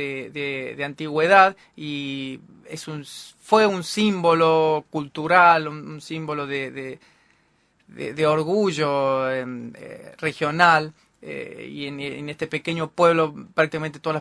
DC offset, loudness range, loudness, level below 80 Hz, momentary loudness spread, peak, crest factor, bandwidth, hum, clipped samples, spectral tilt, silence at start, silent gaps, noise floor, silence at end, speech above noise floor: under 0.1%; 5 LU; -21 LUFS; -66 dBFS; 19 LU; 0 dBFS; 22 dB; 11 kHz; none; under 0.1%; -5 dB/octave; 0 s; none; -63 dBFS; 0 s; 41 dB